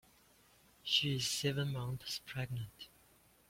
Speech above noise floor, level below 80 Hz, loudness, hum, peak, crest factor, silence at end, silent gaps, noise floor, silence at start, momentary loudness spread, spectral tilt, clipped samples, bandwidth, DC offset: 30 dB; -68 dBFS; -37 LUFS; none; -18 dBFS; 22 dB; 0.6 s; none; -68 dBFS; 0.85 s; 17 LU; -3.5 dB/octave; under 0.1%; 16.5 kHz; under 0.1%